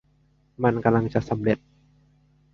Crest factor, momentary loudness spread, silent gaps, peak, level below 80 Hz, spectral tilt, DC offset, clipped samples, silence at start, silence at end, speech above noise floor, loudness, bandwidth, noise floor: 22 dB; 5 LU; none; -4 dBFS; -54 dBFS; -9 dB/octave; under 0.1%; under 0.1%; 0.6 s; 1 s; 40 dB; -24 LUFS; 6.8 kHz; -63 dBFS